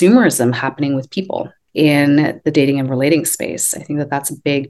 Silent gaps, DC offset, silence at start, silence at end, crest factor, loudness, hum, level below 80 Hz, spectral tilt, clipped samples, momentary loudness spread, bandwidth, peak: none; under 0.1%; 0 s; 0 s; 14 dB; -16 LUFS; none; -60 dBFS; -5 dB/octave; under 0.1%; 10 LU; 12.5 kHz; 0 dBFS